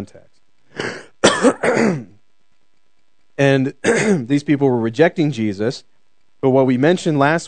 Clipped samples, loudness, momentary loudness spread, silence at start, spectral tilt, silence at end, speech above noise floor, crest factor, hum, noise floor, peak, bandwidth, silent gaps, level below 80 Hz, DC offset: under 0.1%; -17 LUFS; 13 LU; 0 s; -5.5 dB/octave; 0 s; 52 dB; 18 dB; none; -68 dBFS; 0 dBFS; 9.4 kHz; none; -60 dBFS; 0.4%